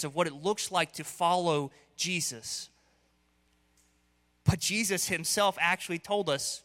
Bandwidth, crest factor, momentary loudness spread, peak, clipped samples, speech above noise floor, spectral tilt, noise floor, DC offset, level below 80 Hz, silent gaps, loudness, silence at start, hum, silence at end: 16.5 kHz; 20 dB; 8 LU; -10 dBFS; under 0.1%; 40 dB; -3 dB/octave; -70 dBFS; under 0.1%; -56 dBFS; none; -30 LUFS; 0 s; 60 Hz at -65 dBFS; 0.05 s